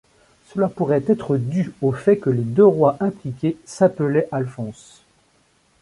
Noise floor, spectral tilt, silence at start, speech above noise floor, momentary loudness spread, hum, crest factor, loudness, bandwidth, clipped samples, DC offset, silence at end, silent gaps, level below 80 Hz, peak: -60 dBFS; -8.5 dB/octave; 0.55 s; 41 dB; 11 LU; none; 18 dB; -20 LUFS; 11.5 kHz; under 0.1%; under 0.1%; 1.1 s; none; -58 dBFS; -2 dBFS